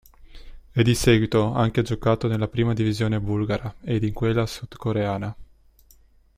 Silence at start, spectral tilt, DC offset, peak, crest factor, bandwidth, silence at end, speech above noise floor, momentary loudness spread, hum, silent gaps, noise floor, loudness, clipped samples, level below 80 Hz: 0.2 s; -6.5 dB/octave; under 0.1%; -6 dBFS; 18 dB; 15.5 kHz; 0.95 s; 33 dB; 10 LU; none; none; -55 dBFS; -23 LUFS; under 0.1%; -42 dBFS